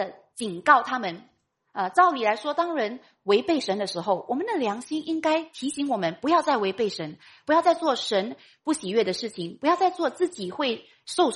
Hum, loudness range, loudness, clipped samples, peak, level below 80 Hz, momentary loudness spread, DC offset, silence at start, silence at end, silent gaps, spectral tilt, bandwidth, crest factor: none; 2 LU; -25 LUFS; under 0.1%; -4 dBFS; -72 dBFS; 13 LU; under 0.1%; 0 s; 0 s; none; -4 dB/octave; 11.5 kHz; 22 dB